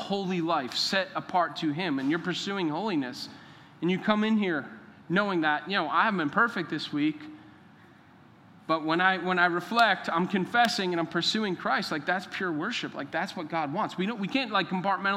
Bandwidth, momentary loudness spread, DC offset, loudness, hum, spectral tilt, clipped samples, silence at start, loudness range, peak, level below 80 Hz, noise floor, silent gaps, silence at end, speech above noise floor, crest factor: 15.5 kHz; 8 LU; under 0.1%; -28 LUFS; none; -5 dB/octave; under 0.1%; 0 s; 4 LU; -8 dBFS; -78 dBFS; -55 dBFS; none; 0 s; 27 dB; 20 dB